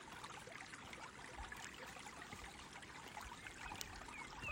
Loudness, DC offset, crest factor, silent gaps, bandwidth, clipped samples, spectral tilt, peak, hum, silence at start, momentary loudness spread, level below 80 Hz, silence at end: -52 LUFS; under 0.1%; 32 dB; none; 16 kHz; under 0.1%; -2.5 dB/octave; -20 dBFS; none; 0 s; 4 LU; -64 dBFS; 0 s